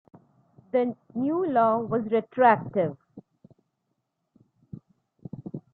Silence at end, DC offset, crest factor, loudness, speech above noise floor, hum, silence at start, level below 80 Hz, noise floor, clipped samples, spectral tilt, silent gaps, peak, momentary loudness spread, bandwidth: 0.15 s; under 0.1%; 22 dB; -25 LUFS; 55 dB; none; 0.75 s; -70 dBFS; -78 dBFS; under 0.1%; -10.5 dB/octave; none; -6 dBFS; 26 LU; 4.5 kHz